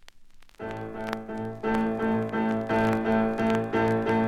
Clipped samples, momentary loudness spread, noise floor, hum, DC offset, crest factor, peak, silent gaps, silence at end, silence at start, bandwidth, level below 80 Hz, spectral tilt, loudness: under 0.1%; 11 LU; -49 dBFS; none; under 0.1%; 18 dB; -8 dBFS; none; 0 s; 0.05 s; 12 kHz; -52 dBFS; -7.5 dB/octave; -27 LUFS